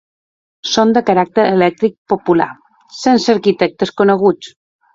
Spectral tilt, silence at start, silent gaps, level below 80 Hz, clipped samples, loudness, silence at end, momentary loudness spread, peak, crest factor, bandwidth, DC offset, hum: -5.5 dB/octave; 0.65 s; 1.98-2.06 s; -56 dBFS; under 0.1%; -14 LUFS; 0.45 s; 7 LU; 0 dBFS; 14 dB; 7.8 kHz; under 0.1%; none